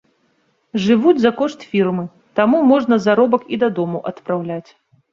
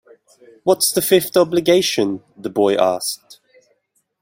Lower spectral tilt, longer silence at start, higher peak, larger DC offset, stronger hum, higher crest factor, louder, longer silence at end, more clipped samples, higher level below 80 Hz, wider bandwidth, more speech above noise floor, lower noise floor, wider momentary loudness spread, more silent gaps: first, -7 dB/octave vs -3.5 dB/octave; about the same, 0.75 s vs 0.65 s; about the same, -2 dBFS vs -2 dBFS; neither; neither; about the same, 16 dB vs 18 dB; about the same, -17 LUFS vs -17 LUFS; second, 0.5 s vs 1.05 s; neither; about the same, -60 dBFS vs -62 dBFS; second, 7.4 kHz vs 16.5 kHz; about the same, 47 dB vs 49 dB; about the same, -63 dBFS vs -66 dBFS; about the same, 12 LU vs 11 LU; neither